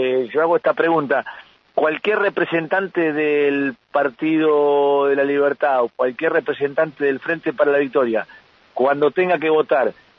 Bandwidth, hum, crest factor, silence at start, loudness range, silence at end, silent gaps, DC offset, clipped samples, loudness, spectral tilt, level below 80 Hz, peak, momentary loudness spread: 5.4 kHz; none; 14 dB; 0 s; 2 LU; 0.25 s; none; under 0.1%; under 0.1%; -19 LUFS; -8 dB/octave; -70 dBFS; -4 dBFS; 5 LU